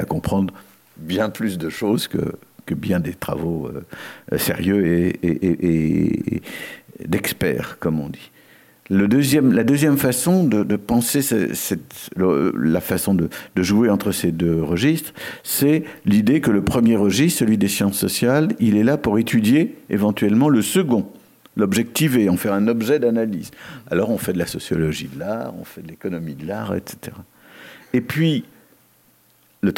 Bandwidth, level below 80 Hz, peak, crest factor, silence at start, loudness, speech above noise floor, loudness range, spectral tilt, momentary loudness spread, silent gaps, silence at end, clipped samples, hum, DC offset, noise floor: 17 kHz; -50 dBFS; -4 dBFS; 14 dB; 0 s; -19 LUFS; 38 dB; 8 LU; -5.5 dB/octave; 13 LU; none; 0 s; under 0.1%; none; under 0.1%; -57 dBFS